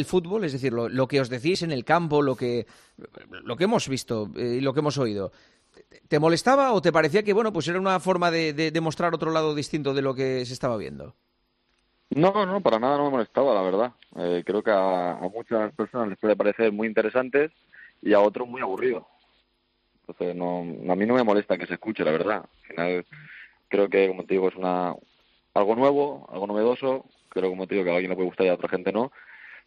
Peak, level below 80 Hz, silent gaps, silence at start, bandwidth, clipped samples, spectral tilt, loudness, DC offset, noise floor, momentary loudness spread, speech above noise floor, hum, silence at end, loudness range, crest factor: -6 dBFS; -64 dBFS; none; 0 s; 11.5 kHz; under 0.1%; -6 dB/octave; -25 LUFS; under 0.1%; -71 dBFS; 11 LU; 46 dB; none; 0.1 s; 4 LU; 20 dB